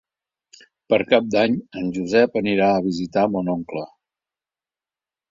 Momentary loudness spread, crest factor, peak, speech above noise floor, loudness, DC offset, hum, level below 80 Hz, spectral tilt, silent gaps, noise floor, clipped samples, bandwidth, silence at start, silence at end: 10 LU; 20 dB; -2 dBFS; over 70 dB; -20 LUFS; under 0.1%; none; -58 dBFS; -6.5 dB/octave; none; under -90 dBFS; under 0.1%; 7.6 kHz; 0.9 s; 1.45 s